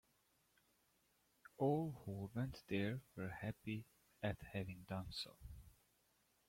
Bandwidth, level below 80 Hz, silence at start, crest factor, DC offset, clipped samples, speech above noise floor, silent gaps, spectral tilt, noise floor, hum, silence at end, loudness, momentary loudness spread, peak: 16.5 kHz; -68 dBFS; 1.6 s; 20 dB; under 0.1%; under 0.1%; 35 dB; none; -7 dB/octave; -79 dBFS; none; 0.75 s; -46 LUFS; 17 LU; -28 dBFS